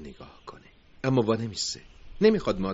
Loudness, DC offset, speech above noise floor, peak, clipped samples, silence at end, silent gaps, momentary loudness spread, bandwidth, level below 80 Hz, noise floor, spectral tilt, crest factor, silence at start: -26 LUFS; under 0.1%; 27 dB; -8 dBFS; under 0.1%; 0 s; none; 23 LU; 8 kHz; -50 dBFS; -52 dBFS; -5.5 dB/octave; 18 dB; 0 s